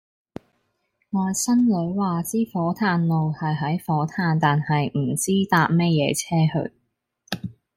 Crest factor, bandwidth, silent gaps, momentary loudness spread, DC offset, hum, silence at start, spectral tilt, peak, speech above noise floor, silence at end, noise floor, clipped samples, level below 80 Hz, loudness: 18 dB; 16 kHz; none; 13 LU; under 0.1%; none; 1.15 s; -5.5 dB/octave; -6 dBFS; 51 dB; 0.25 s; -72 dBFS; under 0.1%; -60 dBFS; -22 LUFS